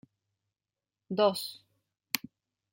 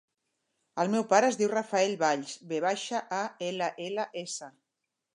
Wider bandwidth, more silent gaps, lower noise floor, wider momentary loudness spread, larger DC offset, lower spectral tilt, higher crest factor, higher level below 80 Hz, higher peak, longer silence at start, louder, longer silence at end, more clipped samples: first, 16.5 kHz vs 11 kHz; neither; first, under -90 dBFS vs -85 dBFS; second, 10 LU vs 13 LU; neither; about the same, -3.5 dB/octave vs -3.5 dB/octave; first, 32 dB vs 22 dB; about the same, -82 dBFS vs -84 dBFS; first, -4 dBFS vs -8 dBFS; first, 1.1 s vs 0.75 s; second, -32 LUFS vs -29 LUFS; about the same, 0.55 s vs 0.65 s; neither